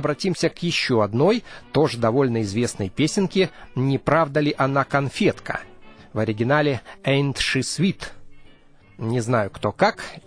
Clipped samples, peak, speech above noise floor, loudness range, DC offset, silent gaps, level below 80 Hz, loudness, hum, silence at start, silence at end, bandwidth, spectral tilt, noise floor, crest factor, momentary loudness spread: under 0.1%; -4 dBFS; 28 dB; 2 LU; under 0.1%; none; -50 dBFS; -22 LUFS; none; 0 s; 0.1 s; 10.5 kHz; -5.5 dB/octave; -49 dBFS; 18 dB; 7 LU